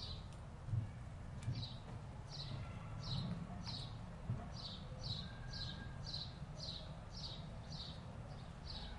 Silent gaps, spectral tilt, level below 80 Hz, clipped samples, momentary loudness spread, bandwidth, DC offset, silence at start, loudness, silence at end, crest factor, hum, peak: none; -5.5 dB/octave; -56 dBFS; under 0.1%; 7 LU; 11 kHz; under 0.1%; 0 s; -48 LUFS; 0 s; 18 dB; none; -30 dBFS